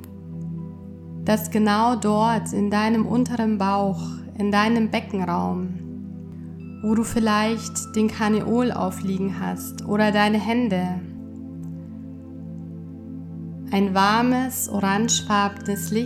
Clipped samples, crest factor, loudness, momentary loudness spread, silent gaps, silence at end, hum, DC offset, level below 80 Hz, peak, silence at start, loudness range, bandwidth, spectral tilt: under 0.1%; 18 dB; -22 LUFS; 17 LU; none; 0 s; none; under 0.1%; -54 dBFS; -4 dBFS; 0 s; 4 LU; 15 kHz; -5 dB/octave